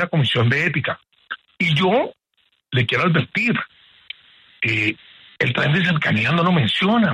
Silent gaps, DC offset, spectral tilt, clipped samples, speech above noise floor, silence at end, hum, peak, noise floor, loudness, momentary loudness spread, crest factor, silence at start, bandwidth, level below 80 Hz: none; under 0.1%; -6.5 dB/octave; under 0.1%; 47 dB; 0 s; none; -4 dBFS; -66 dBFS; -19 LUFS; 17 LU; 16 dB; 0 s; 10.5 kHz; -56 dBFS